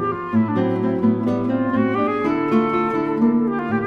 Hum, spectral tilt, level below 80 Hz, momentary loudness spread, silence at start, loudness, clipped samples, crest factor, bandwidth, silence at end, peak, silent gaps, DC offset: none; -9 dB/octave; -54 dBFS; 3 LU; 0 s; -20 LUFS; under 0.1%; 14 dB; 5.2 kHz; 0 s; -6 dBFS; none; under 0.1%